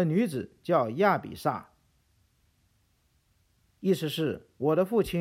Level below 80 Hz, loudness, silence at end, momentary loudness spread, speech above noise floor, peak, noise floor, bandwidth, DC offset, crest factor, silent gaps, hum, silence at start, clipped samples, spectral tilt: -60 dBFS; -28 LUFS; 0 s; 8 LU; 42 dB; -12 dBFS; -69 dBFS; 16.5 kHz; under 0.1%; 18 dB; none; none; 0 s; under 0.1%; -6.5 dB/octave